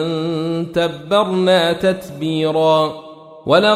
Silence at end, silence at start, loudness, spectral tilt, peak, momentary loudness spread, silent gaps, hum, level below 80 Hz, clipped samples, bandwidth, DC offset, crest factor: 0 s; 0 s; -17 LUFS; -6 dB/octave; -2 dBFS; 8 LU; none; none; -54 dBFS; under 0.1%; 15 kHz; under 0.1%; 16 dB